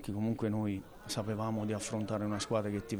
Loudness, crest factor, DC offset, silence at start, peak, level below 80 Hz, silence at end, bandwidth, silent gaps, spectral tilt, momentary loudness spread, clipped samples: -36 LUFS; 16 dB; under 0.1%; 0 s; -20 dBFS; -58 dBFS; 0 s; over 20 kHz; none; -5.5 dB/octave; 4 LU; under 0.1%